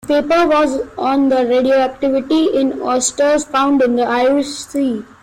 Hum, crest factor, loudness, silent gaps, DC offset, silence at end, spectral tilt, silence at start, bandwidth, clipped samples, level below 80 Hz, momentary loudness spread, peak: none; 10 dB; -15 LUFS; none; under 0.1%; 0.2 s; -3 dB/octave; 0.05 s; 15.5 kHz; under 0.1%; -48 dBFS; 6 LU; -4 dBFS